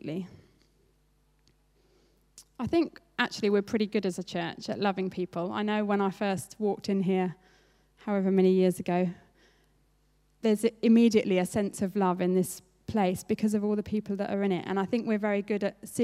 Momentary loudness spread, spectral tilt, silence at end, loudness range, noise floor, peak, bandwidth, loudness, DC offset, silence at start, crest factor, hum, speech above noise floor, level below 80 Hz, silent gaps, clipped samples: 10 LU; -6 dB/octave; 0 s; 5 LU; -67 dBFS; -10 dBFS; 15 kHz; -29 LUFS; under 0.1%; 0.05 s; 20 dB; 50 Hz at -65 dBFS; 40 dB; -64 dBFS; none; under 0.1%